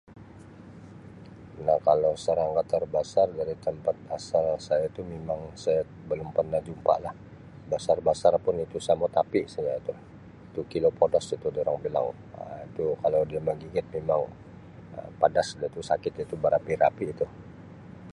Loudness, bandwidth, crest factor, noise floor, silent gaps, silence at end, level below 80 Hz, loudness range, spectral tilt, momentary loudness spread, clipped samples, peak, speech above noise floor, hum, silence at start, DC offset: -28 LUFS; 11 kHz; 22 dB; -47 dBFS; none; 0 s; -56 dBFS; 3 LU; -6 dB/octave; 22 LU; under 0.1%; -6 dBFS; 20 dB; none; 0.1 s; under 0.1%